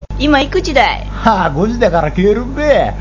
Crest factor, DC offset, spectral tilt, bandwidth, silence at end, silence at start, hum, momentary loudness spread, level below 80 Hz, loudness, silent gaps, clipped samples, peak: 12 dB; 0.6%; -6 dB/octave; 7.8 kHz; 0 s; 0 s; 50 Hz at -25 dBFS; 3 LU; -24 dBFS; -13 LUFS; none; 0.1%; 0 dBFS